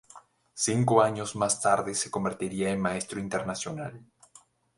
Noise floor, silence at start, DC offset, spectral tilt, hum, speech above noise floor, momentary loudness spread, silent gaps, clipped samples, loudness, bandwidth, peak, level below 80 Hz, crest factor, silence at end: -59 dBFS; 0.15 s; under 0.1%; -4.5 dB/octave; none; 31 dB; 12 LU; none; under 0.1%; -28 LUFS; 11.5 kHz; -6 dBFS; -60 dBFS; 24 dB; 0.75 s